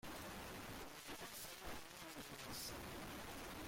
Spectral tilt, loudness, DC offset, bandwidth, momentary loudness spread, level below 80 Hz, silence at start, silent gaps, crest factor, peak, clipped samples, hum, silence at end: -3 dB/octave; -51 LUFS; under 0.1%; 16.5 kHz; 4 LU; -64 dBFS; 0.05 s; none; 12 dB; -38 dBFS; under 0.1%; none; 0 s